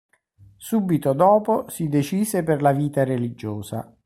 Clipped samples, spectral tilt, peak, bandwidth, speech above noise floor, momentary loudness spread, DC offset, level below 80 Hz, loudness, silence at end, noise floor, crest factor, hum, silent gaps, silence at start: under 0.1%; -7 dB/octave; -4 dBFS; 16 kHz; 32 dB; 14 LU; under 0.1%; -58 dBFS; -21 LUFS; 0.2 s; -53 dBFS; 18 dB; none; none; 0.6 s